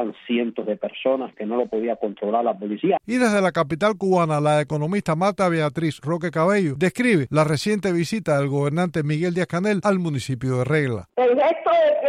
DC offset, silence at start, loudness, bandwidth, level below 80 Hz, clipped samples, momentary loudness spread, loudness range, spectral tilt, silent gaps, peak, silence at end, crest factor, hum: under 0.1%; 0 s; -22 LUFS; 13 kHz; -58 dBFS; under 0.1%; 7 LU; 2 LU; -6.5 dB/octave; none; -6 dBFS; 0 s; 14 dB; none